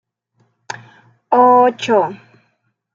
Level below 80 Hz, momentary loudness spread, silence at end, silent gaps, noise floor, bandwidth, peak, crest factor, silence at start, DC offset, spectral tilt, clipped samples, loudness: -70 dBFS; 22 LU; 0.8 s; none; -66 dBFS; 7.6 kHz; -2 dBFS; 16 dB; 0.7 s; under 0.1%; -5 dB/octave; under 0.1%; -13 LUFS